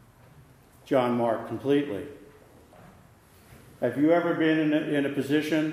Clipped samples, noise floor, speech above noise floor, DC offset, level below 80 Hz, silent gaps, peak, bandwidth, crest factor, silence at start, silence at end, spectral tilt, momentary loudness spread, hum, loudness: under 0.1%; -55 dBFS; 30 dB; under 0.1%; -66 dBFS; none; -10 dBFS; 15 kHz; 18 dB; 0.85 s; 0 s; -6.5 dB/octave; 8 LU; none; -26 LUFS